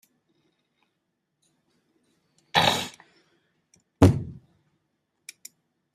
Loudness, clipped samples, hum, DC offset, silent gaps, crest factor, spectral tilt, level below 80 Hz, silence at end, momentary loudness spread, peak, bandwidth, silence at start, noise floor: -23 LUFS; under 0.1%; none; under 0.1%; none; 26 dB; -5 dB/octave; -52 dBFS; 1.6 s; 26 LU; -4 dBFS; 15.5 kHz; 2.55 s; -78 dBFS